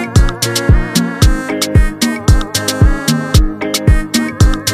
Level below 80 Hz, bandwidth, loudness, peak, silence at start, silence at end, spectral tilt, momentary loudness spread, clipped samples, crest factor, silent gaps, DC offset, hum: -14 dBFS; 15.5 kHz; -13 LUFS; 0 dBFS; 0 s; 0 s; -4.5 dB/octave; 3 LU; under 0.1%; 12 dB; none; under 0.1%; none